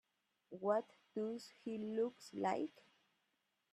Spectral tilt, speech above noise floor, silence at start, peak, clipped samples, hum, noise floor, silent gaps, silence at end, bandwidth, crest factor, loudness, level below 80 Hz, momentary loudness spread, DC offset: -6 dB/octave; 43 dB; 0.5 s; -22 dBFS; under 0.1%; none; -85 dBFS; none; 1 s; 13.5 kHz; 22 dB; -43 LUFS; -88 dBFS; 10 LU; under 0.1%